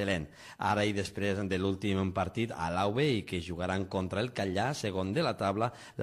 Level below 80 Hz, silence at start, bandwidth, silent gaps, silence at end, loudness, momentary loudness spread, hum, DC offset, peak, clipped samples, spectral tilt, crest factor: -52 dBFS; 0 s; 13.5 kHz; none; 0 s; -32 LUFS; 5 LU; none; under 0.1%; -16 dBFS; under 0.1%; -6 dB/octave; 16 dB